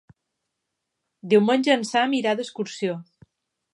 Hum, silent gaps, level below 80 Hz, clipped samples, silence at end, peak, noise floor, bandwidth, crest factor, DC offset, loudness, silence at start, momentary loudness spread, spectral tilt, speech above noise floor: none; none; -74 dBFS; under 0.1%; 0.7 s; -6 dBFS; -81 dBFS; 11.5 kHz; 18 dB; under 0.1%; -22 LUFS; 1.25 s; 12 LU; -5 dB/octave; 59 dB